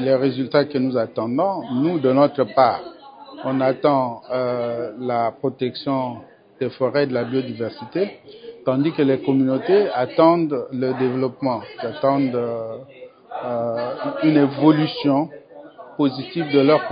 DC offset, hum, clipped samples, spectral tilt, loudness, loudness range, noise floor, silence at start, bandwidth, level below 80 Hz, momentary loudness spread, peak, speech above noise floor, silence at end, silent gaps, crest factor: under 0.1%; none; under 0.1%; -11.5 dB/octave; -21 LUFS; 4 LU; -41 dBFS; 0 s; 5.2 kHz; -66 dBFS; 13 LU; -2 dBFS; 21 dB; 0 s; none; 18 dB